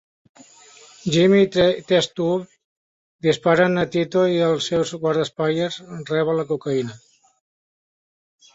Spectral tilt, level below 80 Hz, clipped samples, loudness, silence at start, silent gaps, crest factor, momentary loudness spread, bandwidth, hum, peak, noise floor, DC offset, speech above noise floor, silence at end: -5.5 dB/octave; -58 dBFS; under 0.1%; -20 LUFS; 1.05 s; 2.64-3.19 s; 18 dB; 10 LU; 8 kHz; none; -4 dBFS; -48 dBFS; under 0.1%; 29 dB; 1.6 s